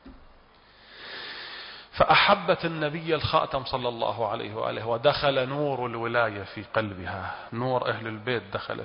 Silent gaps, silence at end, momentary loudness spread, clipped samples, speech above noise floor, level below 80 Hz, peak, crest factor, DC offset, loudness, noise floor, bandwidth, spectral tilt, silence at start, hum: none; 0 s; 16 LU; under 0.1%; 29 dB; -52 dBFS; -8 dBFS; 20 dB; under 0.1%; -26 LUFS; -55 dBFS; 5.4 kHz; -9.5 dB/octave; 0.05 s; none